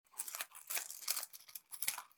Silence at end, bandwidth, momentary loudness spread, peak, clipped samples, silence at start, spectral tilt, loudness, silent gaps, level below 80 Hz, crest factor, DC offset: 0.1 s; 19.5 kHz; 9 LU; -16 dBFS; under 0.1%; 0.15 s; 3 dB/octave; -41 LUFS; none; under -90 dBFS; 28 dB; under 0.1%